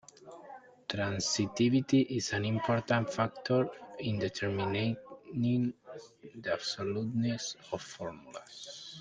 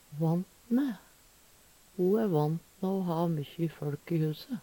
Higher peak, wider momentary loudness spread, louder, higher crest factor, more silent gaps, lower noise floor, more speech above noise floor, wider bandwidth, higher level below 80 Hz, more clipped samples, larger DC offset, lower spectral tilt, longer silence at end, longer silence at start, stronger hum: first, -14 dBFS vs -18 dBFS; first, 19 LU vs 8 LU; about the same, -33 LUFS vs -32 LUFS; about the same, 18 dB vs 14 dB; neither; second, -52 dBFS vs -60 dBFS; second, 20 dB vs 30 dB; second, 9.6 kHz vs 18 kHz; about the same, -68 dBFS vs -68 dBFS; neither; neither; second, -5 dB/octave vs -8.5 dB/octave; about the same, 0 s vs 0 s; first, 0.25 s vs 0.1 s; neither